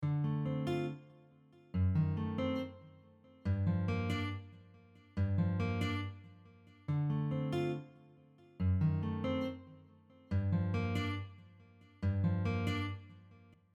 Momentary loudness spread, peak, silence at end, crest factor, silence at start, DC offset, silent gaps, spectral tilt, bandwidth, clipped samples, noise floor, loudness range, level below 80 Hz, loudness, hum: 14 LU; -22 dBFS; 0.4 s; 14 dB; 0 s; under 0.1%; none; -8 dB/octave; 7.8 kHz; under 0.1%; -63 dBFS; 2 LU; -58 dBFS; -37 LUFS; none